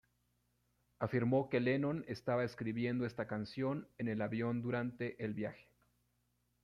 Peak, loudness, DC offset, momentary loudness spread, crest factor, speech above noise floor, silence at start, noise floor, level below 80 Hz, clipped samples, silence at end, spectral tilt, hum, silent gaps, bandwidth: -20 dBFS; -38 LUFS; under 0.1%; 8 LU; 20 dB; 42 dB; 1 s; -80 dBFS; -72 dBFS; under 0.1%; 1 s; -8.5 dB/octave; 60 Hz at -55 dBFS; none; 11 kHz